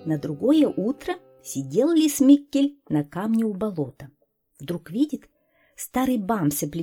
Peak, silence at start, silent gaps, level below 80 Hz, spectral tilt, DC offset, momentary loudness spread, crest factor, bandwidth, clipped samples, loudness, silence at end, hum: -6 dBFS; 0 s; none; -58 dBFS; -5.5 dB/octave; under 0.1%; 15 LU; 18 dB; 17.5 kHz; under 0.1%; -23 LUFS; 0 s; none